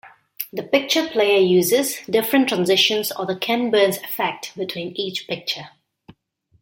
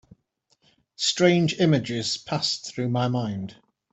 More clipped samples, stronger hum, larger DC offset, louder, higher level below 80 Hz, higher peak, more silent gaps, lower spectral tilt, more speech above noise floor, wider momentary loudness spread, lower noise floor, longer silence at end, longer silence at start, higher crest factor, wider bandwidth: neither; neither; neither; first, -20 LUFS vs -24 LUFS; about the same, -66 dBFS vs -64 dBFS; first, -2 dBFS vs -6 dBFS; neither; second, -3.5 dB/octave vs -5 dB/octave; second, 41 dB vs 46 dB; first, 12 LU vs 9 LU; second, -61 dBFS vs -70 dBFS; first, 0.95 s vs 0.4 s; second, 0.05 s vs 1 s; about the same, 18 dB vs 20 dB; first, 17 kHz vs 8.4 kHz